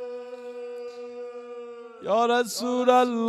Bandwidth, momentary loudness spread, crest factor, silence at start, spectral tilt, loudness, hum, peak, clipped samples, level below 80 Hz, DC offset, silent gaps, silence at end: 14.5 kHz; 19 LU; 20 dB; 0 s; -3.5 dB/octave; -23 LUFS; none; -8 dBFS; under 0.1%; -82 dBFS; under 0.1%; none; 0 s